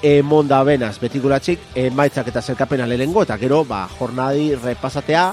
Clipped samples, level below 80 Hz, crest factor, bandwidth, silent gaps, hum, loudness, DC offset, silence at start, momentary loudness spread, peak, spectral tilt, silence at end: under 0.1%; -44 dBFS; 16 dB; 13.5 kHz; none; none; -18 LUFS; under 0.1%; 0 s; 9 LU; 0 dBFS; -6.5 dB/octave; 0 s